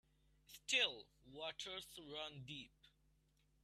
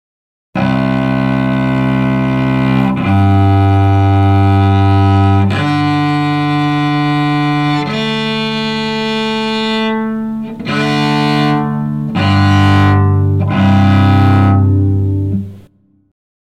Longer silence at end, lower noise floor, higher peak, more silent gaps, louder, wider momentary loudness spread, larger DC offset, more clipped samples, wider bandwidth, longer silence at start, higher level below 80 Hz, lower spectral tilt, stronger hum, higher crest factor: second, 0.75 s vs 0.9 s; first, -78 dBFS vs -47 dBFS; second, -24 dBFS vs -2 dBFS; neither; second, -43 LUFS vs -12 LUFS; first, 22 LU vs 7 LU; second, under 0.1% vs 0.5%; neither; first, 14.5 kHz vs 9 kHz; about the same, 0.5 s vs 0.55 s; second, -76 dBFS vs -40 dBFS; second, -1.5 dB/octave vs -7.5 dB/octave; neither; first, 26 dB vs 10 dB